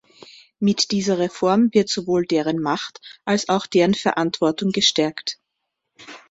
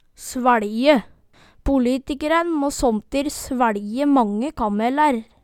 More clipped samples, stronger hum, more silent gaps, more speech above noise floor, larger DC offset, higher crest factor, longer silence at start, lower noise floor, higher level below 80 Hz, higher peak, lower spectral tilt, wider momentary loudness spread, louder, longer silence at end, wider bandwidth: neither; neither; neither; first, 58 dB vs 33 dB; neither; about the same, 18 dB vs 20 dB; first, 0.6 s vs 0.2 s; first, -78 dBFS vs -52 dBFS; second, -60 dBFS vs -40 dBFS; about the same, -2 dBFS vs 0 dBFS; about the same, -4.5 dB/octave vs -4.5 dB/octave; first, 12 LU vs 6 LU; about the same, -20 LUFS vs -20 LUFS; about the same, 0.15 s vs 0.2 s; second, 8 kHz vs 16.5 kHz